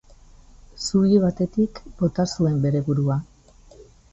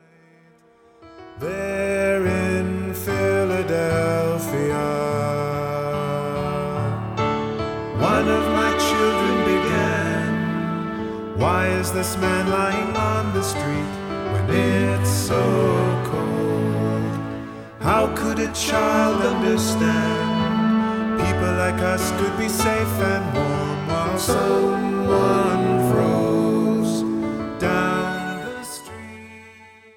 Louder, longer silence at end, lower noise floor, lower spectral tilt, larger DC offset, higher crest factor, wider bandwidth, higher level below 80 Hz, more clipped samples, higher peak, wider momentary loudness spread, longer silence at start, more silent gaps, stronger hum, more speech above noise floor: about the same, -22 LUFS vs -21 LUFS; about the same, 0.3 s vs 0.3 s; about the same, -50 dBFS vs -53 dBFS; first, -7 dB/octave vs -5.5 dB/octave; neither; about the same, 16 dB vs 16 dB; second, 8.2 kHz vs 17.5 kHz; about the same, -48 dBFS vs -44 dBFS; neither; about the same, -6 dBFS vs -6 dBFS; about the same, 8 LU vs 8 LU; second, 0.75 s vs 1 s; neither; neither; second, 29 dB vs 34 dB